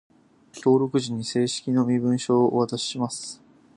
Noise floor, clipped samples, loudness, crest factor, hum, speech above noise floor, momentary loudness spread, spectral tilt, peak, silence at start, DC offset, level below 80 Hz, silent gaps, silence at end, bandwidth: -49 dBFS; under 0.1%; -24 LUFS; 16 dB; none; 26 dB; 9 LU; -5.5 dB/octave; -8 dBFS; 0.55 s; under 0.1%; -68 dBFS; none; 0.4 s; 11 kHz